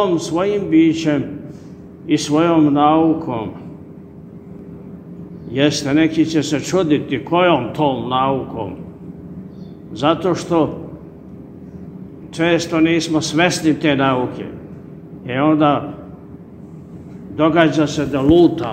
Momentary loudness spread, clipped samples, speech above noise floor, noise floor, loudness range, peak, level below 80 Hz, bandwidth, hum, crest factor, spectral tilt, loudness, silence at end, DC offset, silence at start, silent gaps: 23 LU; under 0.1%; 21 dB; -37 dBFS; 5 LU; 0 dBFS; -46 dBFS; 9.4 kHz; none; 18 dB; -5.5 dB/octave; -16 LUFS; 0 s; under 0.1%; 0 s; none